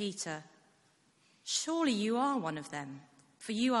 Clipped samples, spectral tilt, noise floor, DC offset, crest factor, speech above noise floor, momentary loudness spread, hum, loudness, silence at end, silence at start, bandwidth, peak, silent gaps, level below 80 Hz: under 0.1%; -3.5 dB/octave; -70 dBFS; under 0.1%; 18 dB; 36 dB; 17 LU; none; -34 LUFS; 0 s; 0 s; 11.5 kHz; -18 dBFS; none; -80 dBFS